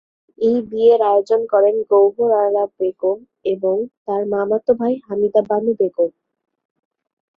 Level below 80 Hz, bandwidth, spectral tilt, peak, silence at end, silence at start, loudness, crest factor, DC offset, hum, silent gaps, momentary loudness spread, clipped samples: -64 dBFS; 6.6 kHz; -8 dB/octave; -4 dBFS; 1.3 s; 0.4 s; -18 LUFS; 14 dB; under 0.1%; none; 3.97-4.05 s; 8 LU; under 0.1%